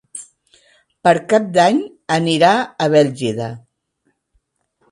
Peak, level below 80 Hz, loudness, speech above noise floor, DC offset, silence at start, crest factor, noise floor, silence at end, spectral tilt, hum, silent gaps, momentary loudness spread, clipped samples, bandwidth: 0 dBFS; -62 dBFS; -16 LUFS; 52 dB; under 0.1%; 0.15 s; 18 dB; -67 dBFS; 1.35 s; -5 dB/octave; none; none; 16 LU; under 0.1%; 11.5 kHz